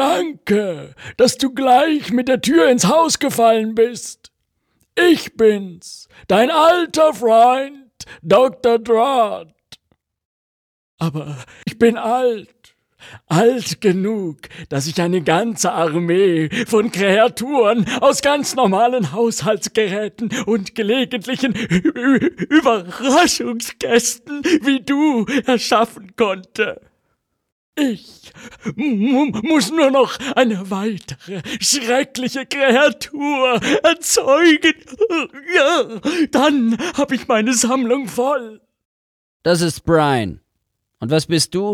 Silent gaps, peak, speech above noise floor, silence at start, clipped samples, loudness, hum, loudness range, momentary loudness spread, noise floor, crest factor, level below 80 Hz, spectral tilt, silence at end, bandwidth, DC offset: 10.25-10.98 s, 27.52-27.73 s, 38.85-39.40 s; 0 dBFS; 57 dB; 0 s; under 0.1%; -16 LUFS; none; 5 LU; 11 LU; -73 dBFS; 16 dB; -54 dBFS; -4 dB/octave; 0 s; 18 kHz; under 0.1%